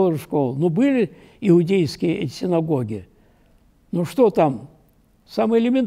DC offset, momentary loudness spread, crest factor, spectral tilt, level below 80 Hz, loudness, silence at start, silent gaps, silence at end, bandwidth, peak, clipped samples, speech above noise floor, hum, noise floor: under 0.1%; 11 LU; 14 dB; -8 dB/octave; -56 dBFS; -20 LUFS; 0 s; none; 0 s; 15.5 kHz; -6 dBFS; under 0.1%; 38 dB; none; -57 dBFS